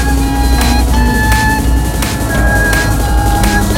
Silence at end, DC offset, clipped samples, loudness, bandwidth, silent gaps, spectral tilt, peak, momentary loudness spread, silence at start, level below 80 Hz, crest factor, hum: 0 s; under 0.1%; under 0.1%; -12 LUFS; 17 kHz; none; -4.5 dB/octave; 0 dBFS; 3 LU; 0 s; -14 dBFS; 10 dB; none